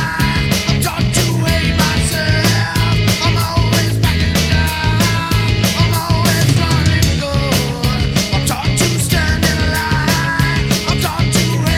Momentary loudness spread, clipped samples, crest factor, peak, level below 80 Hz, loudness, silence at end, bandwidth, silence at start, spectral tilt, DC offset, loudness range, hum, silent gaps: 2 LU; under 0.1%; 14 dB; 0 dBFS; -26 dBFS; -14 LUFS; 0 s; 19.5 kHz; 0 s; -4.5 dB/octave; under 0.1%; 1 LU; none; none